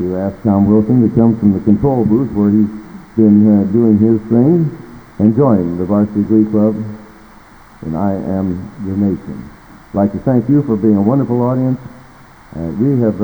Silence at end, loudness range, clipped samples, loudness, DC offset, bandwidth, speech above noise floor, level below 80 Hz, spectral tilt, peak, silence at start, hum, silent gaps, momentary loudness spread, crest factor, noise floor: 0 s; 6 LU; under 0.1%; -13 LUFS; under 0.1%; over 20 kHz; 28 dB; -42 dBFS; -11.5 dB/octave; 0 dBFS; 0 s; none; none; 13 LU; 14 dB; -40 dBFS